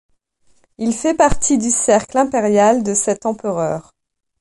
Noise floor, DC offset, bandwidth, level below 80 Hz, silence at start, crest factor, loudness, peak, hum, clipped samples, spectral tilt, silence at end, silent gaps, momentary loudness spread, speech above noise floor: -58 dBFS; under 0.1%; 11.5 kHz; -38 dBFS; 0.8 s; 16 dB; -16 LUFS; -2 dBFS; none; under 0.1%; -4 dB/octave; 0.6 s; none; 8 LU; 42 dB